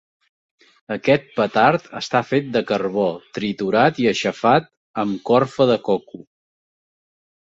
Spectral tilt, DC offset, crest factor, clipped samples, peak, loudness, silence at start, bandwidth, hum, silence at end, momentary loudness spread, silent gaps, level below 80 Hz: -6 dB/octave; under 0.1%; 18 dB; under 0.1%; -2 dBFS; -19 LUFS; 0.9 s; 8 kHz; none; 1.25 s; 8 LU; 4.77-4.94 s; -60 dBFS